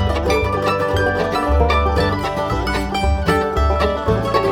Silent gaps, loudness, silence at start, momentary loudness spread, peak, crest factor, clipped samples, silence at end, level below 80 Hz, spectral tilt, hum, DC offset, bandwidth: none; -18 LUFS; 0 s; 4 LU; 0 dBFS; 16 dB; under 0.1%; 0 s; -24 dBFS; -6 dB/octave; none; under 0.1%; 15.5 kHz